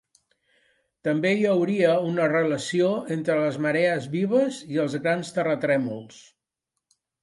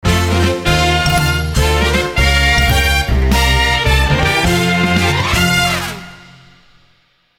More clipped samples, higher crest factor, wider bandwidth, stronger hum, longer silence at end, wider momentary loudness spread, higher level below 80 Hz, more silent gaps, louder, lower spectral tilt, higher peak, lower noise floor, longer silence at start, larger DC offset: neither; about the same, 18 dB vs 14 dB; second, 11.5 kHz vs 17 kHz; neither; second, 1 s vs 1.2 s; first, 6 LU vs 3 LU; second, -72 dBFS vs -20 dBFS; neither; second, -24 LUFS vs -13 LUFS; first, -6 dB/octave vs -4 dB/octave; second, -8 dBFS vs 0 dBFS; first, -83 dBFS vs -55 dBFS; first, 1.05 s vs 0.05 s; neither